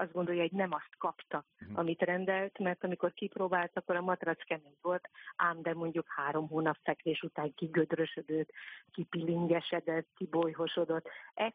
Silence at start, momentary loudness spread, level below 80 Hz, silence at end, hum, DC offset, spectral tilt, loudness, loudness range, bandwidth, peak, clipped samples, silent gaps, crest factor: 0 s; 8 LU; -80 dBFS; 0.05 s; none; under 0.1%; -4.5 dB/octave; -35 LUFS; 1 LU; 4.8 kHz; -16 dBFS; under 0.1%; none; 20 dB